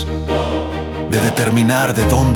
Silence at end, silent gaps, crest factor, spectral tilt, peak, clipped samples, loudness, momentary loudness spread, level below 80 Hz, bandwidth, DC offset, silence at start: 0 s; none; 14 dB; -5.5 dB/octave; -2 dBFS; under 0.1%; -17 LUFS; 8 LU; -30 dBFS; 18 kHz; under 0.1%; 0 s